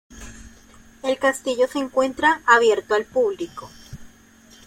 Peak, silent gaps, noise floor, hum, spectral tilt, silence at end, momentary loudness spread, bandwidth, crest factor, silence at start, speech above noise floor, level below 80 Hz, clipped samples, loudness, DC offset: -2 dBFS; none; -50 dBFS; none; -3 dB/octave; 0.6 s; 25 LU; 16 kHz; 20 dB; 0.1 s; 30 dB; -52 dBFS; under 0.1%; -20 LUFS; under 0.1%